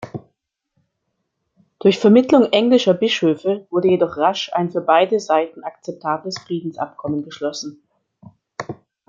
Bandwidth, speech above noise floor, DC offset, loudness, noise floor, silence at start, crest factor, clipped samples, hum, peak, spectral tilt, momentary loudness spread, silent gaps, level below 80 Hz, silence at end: 7.6 kHz; 57 dB; under 0.1%; -18 LUFS; -74 dBFS; 0 s; 18 dB; under 0.1%; none; -2 dBFS; -5.5 dB/octave; 18 LU; none; -66 dBFS; 0.35 s